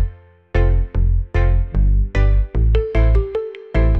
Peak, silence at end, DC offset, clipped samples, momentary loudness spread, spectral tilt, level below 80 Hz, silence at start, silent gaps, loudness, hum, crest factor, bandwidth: -4 dBFS; 0 s; under 0.1%; under 0.1%; 7 LU; -9 dB/octave; -16 dBFS; 0 s; none; -19 LUFS; none; 12 dB; 4.3 kHz